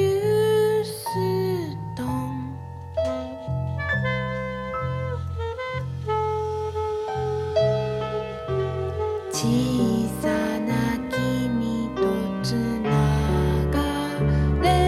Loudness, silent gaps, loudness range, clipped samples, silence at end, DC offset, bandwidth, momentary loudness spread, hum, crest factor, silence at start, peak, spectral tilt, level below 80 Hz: -25 LUFS; none; 4 LU; under 0.1%; 0 s; under 0.1%; 15 kHz; 8 LU; none; 16 dB; 0 s; -8 dBFS; -6.5 dB/octave; -36 dBFS